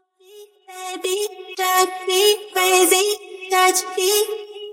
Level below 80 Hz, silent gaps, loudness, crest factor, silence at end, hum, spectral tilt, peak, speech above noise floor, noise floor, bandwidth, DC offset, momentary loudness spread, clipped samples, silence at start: -74 dBFS; none; -18 LUFS; 18 dB; 0 s; none; 1 dB/octave; -2 dBFS; 26 dB; -46 dBFS; 16.5 kHz; under 0.1%; 13 LU; under 0.1%; 0.35 s